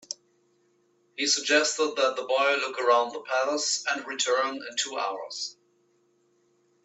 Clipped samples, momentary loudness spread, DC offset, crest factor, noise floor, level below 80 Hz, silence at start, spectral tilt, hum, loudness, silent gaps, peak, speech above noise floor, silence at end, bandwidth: under 0.1%; 12 LU; under 0.1%; 20 dB; -68 dBFS; -84 dBFS; 0.1 s; 0.5 dB/octave; none; -26 LUFS; none; -8 dBFS; 41 dB; 1.35 s; 8.4 kHz